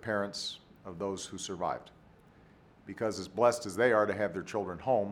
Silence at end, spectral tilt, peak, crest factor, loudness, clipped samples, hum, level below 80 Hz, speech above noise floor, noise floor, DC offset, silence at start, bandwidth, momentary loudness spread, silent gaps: 0 s; -4.5 dB/octave; -12 dBFS; 22 dB; -32 LUFS; under 0.1%; none; -66 dBFS; 27 dB; -59 dBFS; under 0.1%; 0 s; 16 kHz; 12 LU; none